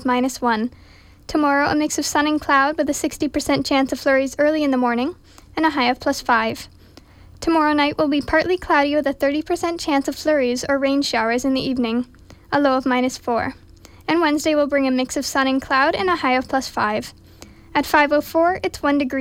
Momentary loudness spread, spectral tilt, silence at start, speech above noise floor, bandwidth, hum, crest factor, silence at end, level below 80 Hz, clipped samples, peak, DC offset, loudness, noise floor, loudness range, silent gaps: 6 LU; -3.5 dB/octave; 0 s; 27 dB; 16.5 kHz; none; 14 dB; 0 s; -48 dBFS; under 0.1%; -4 dBFS; under 0.1%; -19 LUFS; -46 dBFS; 2 LU; none